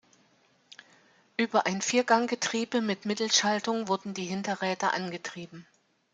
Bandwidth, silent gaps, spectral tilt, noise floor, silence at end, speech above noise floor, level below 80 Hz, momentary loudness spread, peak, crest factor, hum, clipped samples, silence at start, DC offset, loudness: 9.6 kHz; none; -3 dB/octave; -66 dBFS; 0.5 s; 37 dB; -76 dBFS; 13 LU; -8 dBFS; 22 dB; none; under 0.1%; 1.4 s; under 0.1%; -28 LUFS